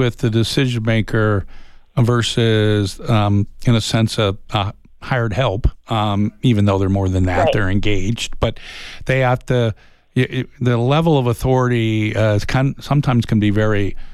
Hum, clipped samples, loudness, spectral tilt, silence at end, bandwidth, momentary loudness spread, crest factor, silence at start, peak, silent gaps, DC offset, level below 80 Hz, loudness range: none; under 0.1%; -18 LUFS; -6.5 dB/octave; 0 s; 13 kHz; 7 LU; 12 dB; 0 s; -4 dBFS; none; under 0.1%; -30 dBFS; 2 LU